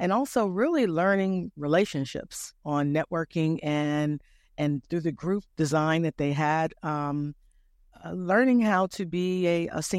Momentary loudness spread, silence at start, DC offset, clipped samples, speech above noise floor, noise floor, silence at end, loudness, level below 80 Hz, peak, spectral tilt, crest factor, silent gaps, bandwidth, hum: 11 LU; 0 s; under 0.1%; under 0.1%; 34 dB; -60 dBFS; 0 s; -27 LUFS; -60 dBFS; -10 dBFS; -6 dB/octave; 16 dB; none; 15.5 kHz; none